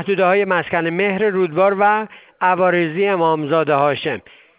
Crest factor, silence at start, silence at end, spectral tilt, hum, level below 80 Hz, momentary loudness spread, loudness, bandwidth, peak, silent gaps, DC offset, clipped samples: 14 dB; 0 s; 0.4 s; -9.5 dB/octave; none; -62 dBFS; 6 LU; -17 LUFS; 4 kHz; -2 dBFS; none; under 0.1%; under 0.1%